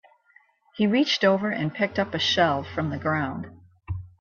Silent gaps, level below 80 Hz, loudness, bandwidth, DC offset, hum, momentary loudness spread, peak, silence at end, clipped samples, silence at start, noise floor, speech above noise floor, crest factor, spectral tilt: none; -56 dBFS; -24 LUFS; 7.2 kHz; under 0.1%; none; 16 LU; -8 dBFS; 0.15 s; under 0.1%; 0.75 s; -60 dBFS; 36 dB; 18 dB; -5.5 dB/octave